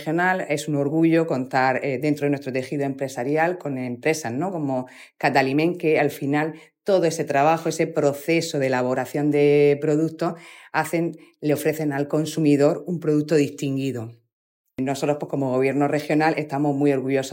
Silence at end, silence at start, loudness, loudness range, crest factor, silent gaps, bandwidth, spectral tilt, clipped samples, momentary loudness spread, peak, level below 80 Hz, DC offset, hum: 0 s; 0 s; -22 LUFS; 3 LU; 16 dB; 14.33-14.65 s; 16.5 kHz; -6 dB/octave; under 0.1%; 8 LU; -6 dBFS; -74 dBFS; under 0.1%; none